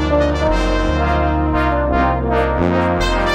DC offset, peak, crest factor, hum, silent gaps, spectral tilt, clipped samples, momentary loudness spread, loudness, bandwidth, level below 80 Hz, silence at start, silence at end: under 0.1%; -2 dBFS; 14 dB; none; none; -6.5 dB/octave; under 0.1%; 1 LU; -16 LUFS; 10 kHz; -22 dBFS; 0 s; 0 s